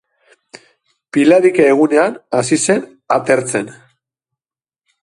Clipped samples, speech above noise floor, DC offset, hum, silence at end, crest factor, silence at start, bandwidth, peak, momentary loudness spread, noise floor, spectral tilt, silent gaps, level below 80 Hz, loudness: under 0.1%; over 77 dB; under 0.1%; none; 1.3 s; 16 dB; 1.15 s; 11.5 kHz; 0 dBFS; 11 LU; under -90 dBFS; -4.5 dB/octave; none; -60 dBFS; -14 LUFS